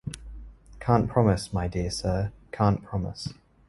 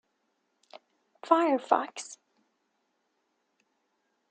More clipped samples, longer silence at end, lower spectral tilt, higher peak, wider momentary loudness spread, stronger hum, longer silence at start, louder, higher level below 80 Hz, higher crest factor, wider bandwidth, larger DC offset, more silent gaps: neither; second, 0.35 s vs 2.15 s; first, -6.5 dB/octave vs -2.5 dB/octave; about the same, -4 dBFS vs -6 dBFS; about the same, 16 LU vs 18 LU; neither; second, 0.05 s vs 1.25 s; about the same, -27 LUFS vs -27 LUFS; first, -42 dBFS vs under -90 dBFS; about the same, 22 dB vs 26 dB; first, 11.5 kHz vs 9.4 kHz; neither; neither